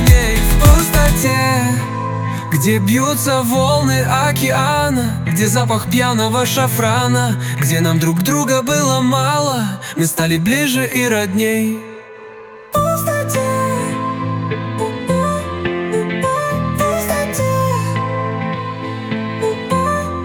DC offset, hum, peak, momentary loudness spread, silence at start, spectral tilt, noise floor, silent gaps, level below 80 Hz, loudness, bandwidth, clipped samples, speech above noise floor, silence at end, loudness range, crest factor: under 0.1%; none; 0 dBFS; 7 LU; 0 s; -5 dB/octave; -35 dBFS; none; -24 dBFS; -16 LUFS; 19 kHz; under 0.1%; 21 dB; 0 s; 4 LU; 16 dB